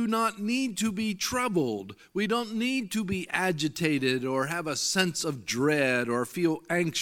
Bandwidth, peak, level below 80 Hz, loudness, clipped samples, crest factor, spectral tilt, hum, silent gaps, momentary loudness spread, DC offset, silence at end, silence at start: 17.5 kHz; -8 dBFS; -64 dBFS; -28 LUFS; under 0.1%; 20 dB; -4 dB/octave; none; none; 5 LU; under 0.1%; 0 s; 0 s